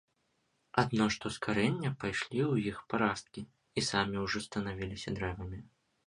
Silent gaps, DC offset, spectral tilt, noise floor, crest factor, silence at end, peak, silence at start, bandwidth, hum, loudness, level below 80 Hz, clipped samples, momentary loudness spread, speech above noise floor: none; under 0.1%; -5 dB/octave; -77 dBFS; 24 dB; 0.4 s; -10 dBFS; 0.75 s; 11.5 kHz; none; -34 LUFS; -56 dBFS; under 0.1%; 10 LU; 44 dB